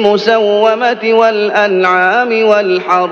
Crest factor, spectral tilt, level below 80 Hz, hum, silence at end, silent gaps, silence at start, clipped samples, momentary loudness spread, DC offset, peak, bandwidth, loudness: 10 dB; -5 dB/octave; -60 dBFS; none; 0 s; none; 0 s; 0.2%; 2 LU; under 0.1%; 0 dBFS; 7.2 kHz; -10 LUFS